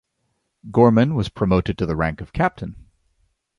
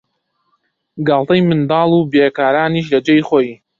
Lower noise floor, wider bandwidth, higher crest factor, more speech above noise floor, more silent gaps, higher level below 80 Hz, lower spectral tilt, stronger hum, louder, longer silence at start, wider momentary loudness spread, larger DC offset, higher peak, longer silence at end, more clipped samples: first, -72 dBFS vs -67 dBFS; first, 10.5 kHz vs 7.4 kHz; about the same, 18 dB vs 14 dB; about the same, 53 dB vs 54 dB; neither; first, -40 dBFS vs -54 dBFS; about the same, -8.5 dB/octave vs -8 dB/octave; neither; second, -20 LUFS vs -14 LUFS; second, 0.65 s vs 0.95 s; first, 9 LU vs 4 LU; neither; about the same, -2 dBFS vs -2 dBFS; first, 0.8 s vs 0.25 s; neither